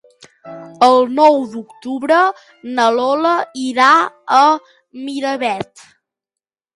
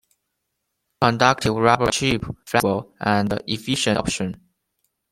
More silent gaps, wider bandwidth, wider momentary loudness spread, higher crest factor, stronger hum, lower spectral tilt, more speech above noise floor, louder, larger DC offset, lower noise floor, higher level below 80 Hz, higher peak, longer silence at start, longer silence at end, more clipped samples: neither; second, 11.5 kHz vs 16 kHz; first, 19 LU vs 8 LU; about the same, 16 dB vs 20 dB; neither; about the same, -3.5 dB/octave vs -4.5 dB/octave; first, 72 dB vs 56 dB; first, -14 LUFS vs -21 LUFS; neither; first, -86 dBFS vs -77 dBFS; second, -64 dBFS vs -48 dBFS; about the same, 0 dBFS vs -2 dBFS; second, 0.45 s vs 1 s; first, 1.15 s vs 0.75 s; neither